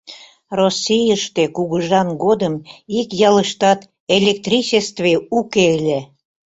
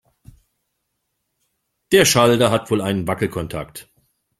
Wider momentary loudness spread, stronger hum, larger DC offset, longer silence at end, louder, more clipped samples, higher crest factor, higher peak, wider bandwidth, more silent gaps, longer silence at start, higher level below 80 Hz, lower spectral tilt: second, 8 LU vs 17 LU; neither; neither; second, 0.45 s vs 0.6 s; about the same, -17 LUFS vs -17 LUFS; neither; about the same, 16 dB vs 20 dB; about the same, 0 dBFS vs -2 dBFS; second, 8.2 kHz vs 16 kHz; first, 4.00-4.07 s vs none; second, 0.1 s vs 1.9 s; second, -56 dBFS vs -50 dBFS; about the same, -4.5 dB/octave vs -4 dB/octave